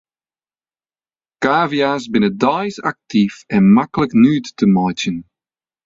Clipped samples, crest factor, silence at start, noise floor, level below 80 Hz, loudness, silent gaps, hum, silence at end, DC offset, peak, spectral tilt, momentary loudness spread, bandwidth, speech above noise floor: under 0.1%; 16 dB; 1.4 s; under -90 dBFS; -52 dBFS; -16 LUFS; none; none; 0.65 s; under 0.1%; -2 dBFS; -6.5 dB/octave; 10 LU; 7.6 kHz; over 75 dB